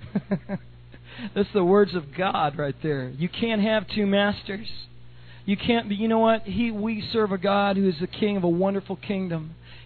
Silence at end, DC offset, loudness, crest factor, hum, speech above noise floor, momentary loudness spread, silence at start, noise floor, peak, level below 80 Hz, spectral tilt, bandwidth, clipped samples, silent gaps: 0 s; under 0.1%; -25 LUFS; 18 dB; none; 23 dB; 13 LU; 0 s; -47 dBFS; -8 dBFS; -52 dBFS; -5 dB/octave; 4.6 kHz; under 0.1%; none